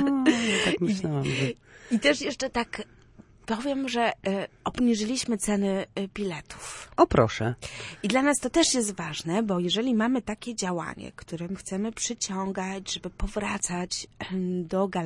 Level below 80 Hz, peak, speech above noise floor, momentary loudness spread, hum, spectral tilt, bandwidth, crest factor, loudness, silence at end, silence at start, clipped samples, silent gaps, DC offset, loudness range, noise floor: -48 dBFS; -6 dBFS; 26 dB; 12 LU; none; -4 dB/octave; 11.5 kHz; 22 dB; -27 LUFS; 0 s; 0 s; under 0.1%; none; under 0.1%; 6 LU; -53 dBFS